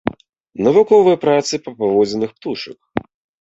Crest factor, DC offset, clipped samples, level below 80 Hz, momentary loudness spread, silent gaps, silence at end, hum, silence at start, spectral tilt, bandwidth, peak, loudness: 14 dB; under 0.1%; under 0.1%; -54 dBFS; 16 LU; 0.29-0.33 s, 0.40-0.44 s; 0.4 s; none; 0.05 s; -5.5 dB/octave; 8 kHz; -2 dBFS; -16 LUFS